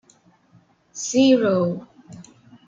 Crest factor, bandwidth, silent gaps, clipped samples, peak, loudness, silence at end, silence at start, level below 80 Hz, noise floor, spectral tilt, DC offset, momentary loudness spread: 18 dB; 7.8 kHz; none; under 0.1%; -6 dBFS; -19 LUFS; 0.45 s; 0.95 s; -66 dBFS; -57 dBFS; -5 dB/octave; under 0.1%; 18 LU